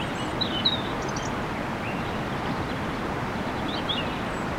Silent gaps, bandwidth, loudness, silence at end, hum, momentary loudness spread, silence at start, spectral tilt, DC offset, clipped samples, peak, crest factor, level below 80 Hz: none; 16.5 kHz; -28 LUFS; 0 s; none; 6 LU; 0 s; -5 dB/octave; under 0.1%; under 0.1%; -12 dBFS; 18 dB; -44 dBFS